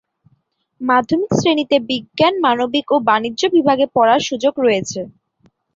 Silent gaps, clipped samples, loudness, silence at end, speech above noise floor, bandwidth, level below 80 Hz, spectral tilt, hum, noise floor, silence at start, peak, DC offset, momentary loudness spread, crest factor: none; under 0.1%; -16 LUFS; 0.65 s; 47 dB; 7.8 kHz; -56 dBFS; -4.5 dB/octave; none; -63 dBFS; 0.8 s; -2 dBFS; under 0.1%; 8 LU; 16 dB